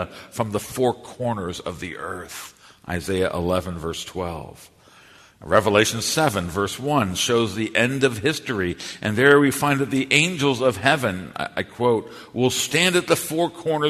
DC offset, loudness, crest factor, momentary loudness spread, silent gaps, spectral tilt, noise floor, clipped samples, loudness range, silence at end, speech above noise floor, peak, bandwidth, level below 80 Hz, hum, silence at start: under 0.1%; -21 LUFS; 22 dB; 14 LU; none; -4 dB/octave; -50 dBFS; under 0.1%; 8 LU; 0 s; 28 dB; 0 dBFS; 13.5 kHz; -50 dBFS; none; 0 s